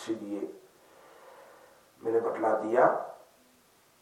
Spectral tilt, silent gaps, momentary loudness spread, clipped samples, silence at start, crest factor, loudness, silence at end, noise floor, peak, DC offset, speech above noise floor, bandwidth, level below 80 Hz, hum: -6 dB/octave; none; 15 LU; under 0.1%; 0 s; 22 dB; -29 LUFS; 0.85 s; -63 dBFS; -10 dBFS; under 0.1%; 35 dB; 16 kHz; -84 dBFS; none